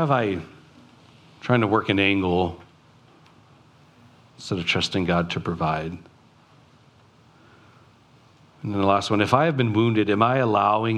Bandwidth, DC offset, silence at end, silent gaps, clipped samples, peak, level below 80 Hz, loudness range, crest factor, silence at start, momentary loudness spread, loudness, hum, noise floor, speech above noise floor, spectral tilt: 11 kHz; under 0.1%; 0 s; none; under 0.1%; -2 dBFS; -56 dBFS; 8 LU; 22 dB; 0 s; 15 LU; -22 LUFS; none; -55 dBFS; 33 dB; -6.5 dB/octave